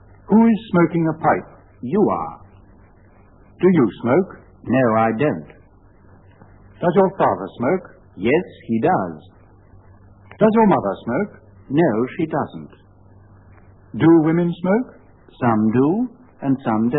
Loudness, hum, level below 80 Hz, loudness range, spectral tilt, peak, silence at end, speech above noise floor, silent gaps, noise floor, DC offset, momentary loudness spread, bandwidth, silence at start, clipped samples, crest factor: -19 LUFS; none; -54 dBFS; 3 LU; -12.5 dB/octave; -2 dBFS; 0 s; 32 dB; none; -49 dBFS; 0.1%; 13 LU; 4.1 kHz; 0.3 s; under 0.1%; 18 dB